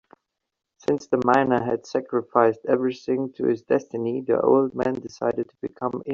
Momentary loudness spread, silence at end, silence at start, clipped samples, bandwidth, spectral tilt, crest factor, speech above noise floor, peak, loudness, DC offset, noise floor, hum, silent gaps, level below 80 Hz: 9 LU; 0 s; 0.9 s; under 0.1%; 7.4 kHz; -6 dB/octave; 20 dB; 36 dB; -4 dBFS; -24 LUFS; under 0.1%; -59 dBFS; none; none; -64 dBFS